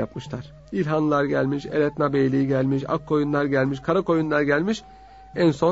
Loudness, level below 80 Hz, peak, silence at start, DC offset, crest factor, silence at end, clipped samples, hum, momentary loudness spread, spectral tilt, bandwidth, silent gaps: -23 LUFS; -52 dBFS; -6 dBFS; 0 s; under 0.1%; 16 dB; 0 s; under 0.1%; none; 10 LU; -7.5 dB/octave; 8 kHz; none